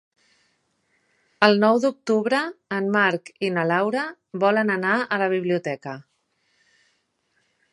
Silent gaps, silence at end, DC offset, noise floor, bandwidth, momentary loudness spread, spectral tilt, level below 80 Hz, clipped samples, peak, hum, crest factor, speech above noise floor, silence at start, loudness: none; 1.7 s; under 0.1%; -70 dBFS; 11.5 kHz; 10 LU; -6 dB/octave; -76 dBFS; under 0.1%; 0 dBFS; none; 24 dB; 48 dB; 1.4 s; -22 LUFS